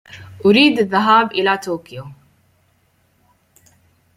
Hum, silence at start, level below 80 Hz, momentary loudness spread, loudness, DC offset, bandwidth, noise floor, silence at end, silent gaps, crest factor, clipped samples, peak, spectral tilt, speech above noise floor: none; 0.15 s; -62 dBFS; 17 LU; -15 LUFS; under 0.1%; 14.5 kHz; -60 dBFS; 2.05 s; none; 18 dB; under 0.1%; 0 dBFS; -5.5 dB/octave; 45 dB